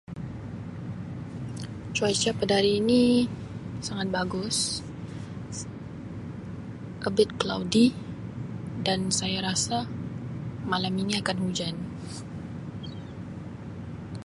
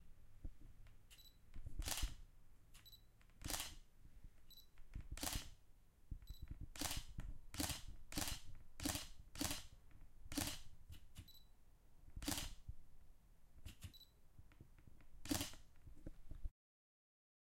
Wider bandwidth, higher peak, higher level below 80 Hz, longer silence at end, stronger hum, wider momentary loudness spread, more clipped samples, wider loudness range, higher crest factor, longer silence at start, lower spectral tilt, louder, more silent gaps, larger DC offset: second, 11.5 kHz vs 16.5 kHz; first, -6 dBFS vs -24 dBFS; about the same, -52 dBFS vs -56 dBFS; second, 0 s vs 1 s; neither; second, 16 LU vs 22 LU; neither; about the same, 6 LU vs 6 LU; about the same, 22 dB vs 26 dB; about the same, 0.1 s vs 0 s; first, -4.5 dB/octave vs -2.5 dB/octave; first, -28 LUFS vs -48 LUFS; neither; neither